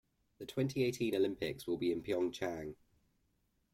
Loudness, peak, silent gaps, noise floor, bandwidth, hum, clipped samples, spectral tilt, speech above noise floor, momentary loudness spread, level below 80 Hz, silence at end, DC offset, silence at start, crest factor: -37 LUFS; -22 dBFS; none; -78 dBFS; 16.5 kHz; none; under 0.1%; -6 dB/octave; 42 dB; 10 LU; -68 dBFS; 1 s; under 0.1%; 0.4 s; 16 dB